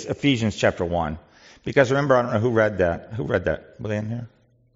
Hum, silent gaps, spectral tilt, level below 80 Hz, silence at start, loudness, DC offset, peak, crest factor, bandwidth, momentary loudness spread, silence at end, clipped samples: none; none; -5 dB/octave; -50 dBFS; 0 s; -22 LUFS; under 0.1%; -2 dBFS; 20 dB; 7.8 kHz; 11 LU; 0.5 s; under 0.1%